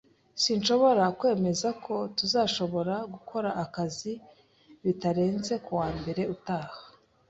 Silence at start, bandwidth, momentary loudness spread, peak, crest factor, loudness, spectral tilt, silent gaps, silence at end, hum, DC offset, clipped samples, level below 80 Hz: 0.35 s; 8.2 kHz; 12 LU; -10 dBFS; 18 dB; -28 LUFS; -5 dB/octave; none; 0.4 s; none; under 0.1%; under 0.1%; -60 dBFS